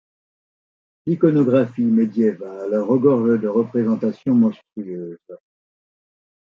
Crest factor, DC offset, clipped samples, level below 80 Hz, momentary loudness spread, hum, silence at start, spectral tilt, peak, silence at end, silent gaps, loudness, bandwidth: 18 dB; under 0.1%; under 0.1%; -68 dBFS; 15 LU; none; 1.05 s; -10.5 dB/octave; -4 dBFS; 1.05 s; none; -19 LUFS; 5 kHz